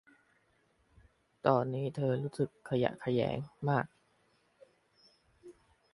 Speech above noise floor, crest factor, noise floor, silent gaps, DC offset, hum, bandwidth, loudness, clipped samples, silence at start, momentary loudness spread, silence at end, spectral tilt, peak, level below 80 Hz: 40 dB; 24 dB; -72 dBFS; none; under 0.1%; none; 11.5 kHz; -34 LUFS; under 0.1%; 1.45 s; 6 LU; 0.45 s; -8 dB/octave; -12 dBFS; -68 dBFS